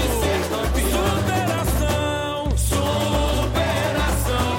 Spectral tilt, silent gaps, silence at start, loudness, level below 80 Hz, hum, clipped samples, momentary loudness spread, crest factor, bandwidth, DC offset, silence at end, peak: -4.5 dB/octave; none; 0 s; -21 LUFS; -26 dBFS; none; under 0.1%; 2 LU; 12 dB; 16.5 kHz; under 0.1%; 0 s; -8 dBFS